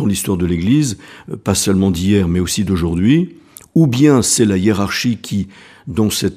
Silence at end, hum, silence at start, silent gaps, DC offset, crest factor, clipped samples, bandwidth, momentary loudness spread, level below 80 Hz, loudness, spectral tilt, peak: 0 s; none; 0 s; none; under 0.1%; 16 dB; under 0.1%; 15.5 kHz; 13 LU; -38 dBFS; -15 LUFS; -5 dB/octave; 0 dBFS